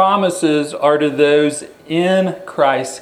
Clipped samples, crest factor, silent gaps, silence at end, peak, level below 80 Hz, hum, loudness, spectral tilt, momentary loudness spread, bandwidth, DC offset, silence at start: under 0.1%; 16 dB; none; 0 s; 0 dBFS; -64 dBFS; none; -15 LUFS; -5 dB/octave; 7 LU; 14.5 kHz; under 0.1%; 0 s